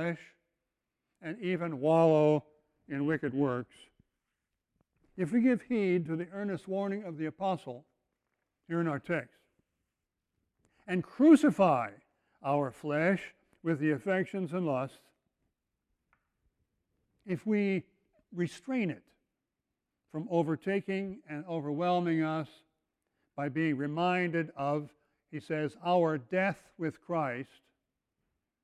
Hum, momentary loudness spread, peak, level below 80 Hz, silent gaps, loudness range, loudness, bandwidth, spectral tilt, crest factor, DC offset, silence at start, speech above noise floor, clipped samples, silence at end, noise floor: none; 16 LU; -10 dBFS; -74 dBFS; none; 9 LU; -31 LUFS; 11.5 kHz; -7.5 dB/octave; 22 dB; under 0.1%; 0 s; 56 dB; under 0.1%; 1.2 s; -87 dBFS